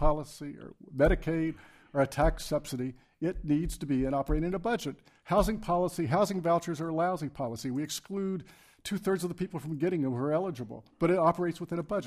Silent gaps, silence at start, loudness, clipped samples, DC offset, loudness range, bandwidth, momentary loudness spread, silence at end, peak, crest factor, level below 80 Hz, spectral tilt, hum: none; 0 s; -31 LUFS; under 0.1%; under 0.1%; 3 LU; 15.5 kHz; 12 LU; 0 s; -12 dBFS; 18 dB; -42 dBFS; -6.5 dB/octave; none